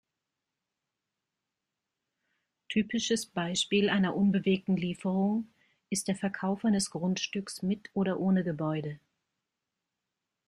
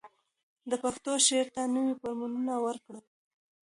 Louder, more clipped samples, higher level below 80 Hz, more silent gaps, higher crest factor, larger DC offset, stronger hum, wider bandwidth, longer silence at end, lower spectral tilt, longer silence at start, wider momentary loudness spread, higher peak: about the same, -30 LUFS vs -30 LUFS; neither; first, -68 dBFS vs -74 dBFS; second, none vs 0.43-0.56 s; about the same, 18 dB vs 22 dB; neither; neither; first, 13 kHz vs 11.5 kHz; first, 1.5 s vs 0.7 s; first, -5 dB/octave vs -1.5 dB/octave; first, 2.7 s vs 0.05 s; second, 8 LU vs 11 LU; about the same, -14 dBFS vs -12 dBFS